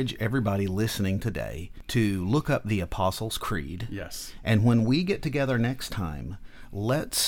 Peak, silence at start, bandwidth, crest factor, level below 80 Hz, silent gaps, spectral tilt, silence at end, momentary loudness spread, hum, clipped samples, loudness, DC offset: -10 dBFS; 0 s; 19 kHz; 16 dB; -44 dBFS; none; -5.5 dB/octave; 0 s; 12 LU; none; under 0.1%; -27 LUFS; under 0.1%